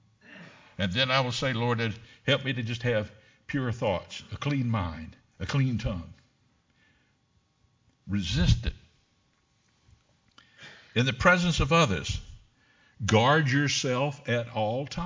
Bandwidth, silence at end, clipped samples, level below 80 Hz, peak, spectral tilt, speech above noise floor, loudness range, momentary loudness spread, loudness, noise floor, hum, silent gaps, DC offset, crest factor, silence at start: 7.6 kHz; 0 s; under 0.1%; -42 dBFS; -6 dBFS; -5 dB/octave; 43 dB; 8 LU; 17 LU; -27 LUFS; -69 dBFS; none; none; under 0.1%; 22 dB; 0.3 s